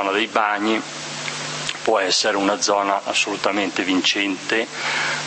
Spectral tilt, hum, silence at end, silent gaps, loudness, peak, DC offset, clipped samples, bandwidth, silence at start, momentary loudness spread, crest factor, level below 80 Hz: -2 dB/octave; none; 0 s; none; -20 LUFS; -2 dBFS; under 0.1%; under 0.1%; 8.8 kHz; 0 s; 8 LU; 20 dB; -68 dBFS